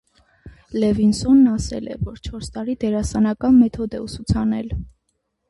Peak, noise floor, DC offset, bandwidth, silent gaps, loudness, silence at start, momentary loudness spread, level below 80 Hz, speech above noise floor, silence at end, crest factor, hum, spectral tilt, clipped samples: -4 dBFS; -72 dBFS; under 0.1%; 11.5 kHz; none; -20 LUFS; 0.45 s; 15 LU; -36 dBFS; 53 dB; 0.6 s; 16 dB; none; -7 dB/octave; under 0.1%